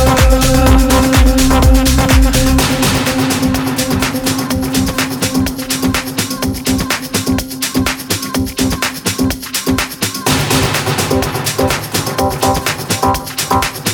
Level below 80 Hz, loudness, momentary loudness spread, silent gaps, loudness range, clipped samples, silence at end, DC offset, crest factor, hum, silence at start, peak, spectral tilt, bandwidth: -18 dBFS; -13 LUFS; 7 LU; none; 5 LU; under 0.1%; 0 s; under 0.1%; 12 dB; none; 0 s; 0 dBFS; -4 dB/octave; over 20 kHz